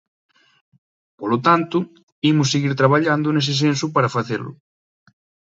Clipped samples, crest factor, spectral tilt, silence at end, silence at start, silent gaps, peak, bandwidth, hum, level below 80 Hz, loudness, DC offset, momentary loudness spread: under 0.1%; 20 dB; -5.5 dB/octave; 1.05 s; 1.2 s; 2.03-2.22 s; 0 dBFS; 8 kHz; none; -64 dBFS; -19 LUFS; under 0.1%; 11 LU